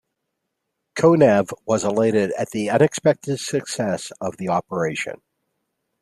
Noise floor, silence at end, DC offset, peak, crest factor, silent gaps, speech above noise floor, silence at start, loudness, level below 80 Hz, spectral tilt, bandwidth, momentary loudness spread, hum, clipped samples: -78 dBFS; 0.85 s; under 0.1%; -2 dBFS; 18 dB; none; 58 dB; 0.95 s; -20 LUFS; -62 dBFS; -5.5 dB/octave; 13.5 kHz; 12 LU; none; under 0.1%